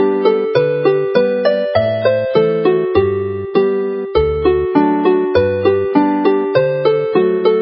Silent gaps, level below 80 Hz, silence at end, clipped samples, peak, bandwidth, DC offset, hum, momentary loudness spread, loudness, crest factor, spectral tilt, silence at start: none; -36 dBFS; 0 s; under 0.1%; 0 dBFS; 5.8 kHz; under 0.1%; none; 3 LU; -14 LUFS; 14 dB; -12 dB/octave; 0 s